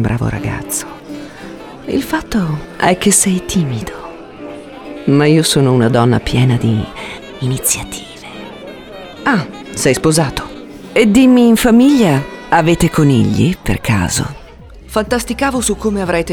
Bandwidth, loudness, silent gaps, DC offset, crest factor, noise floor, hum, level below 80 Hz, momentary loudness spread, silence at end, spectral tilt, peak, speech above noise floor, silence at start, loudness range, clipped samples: 19.5 kHz; -13 LUFS; none; under 0.1%; 14 dB; -35 dBFS; none; -34 dBFS; 21 LU; 0 s; -5 dB/octave; 0 dBFS; 23 dB; 0 s; 7 LU; under 0.1%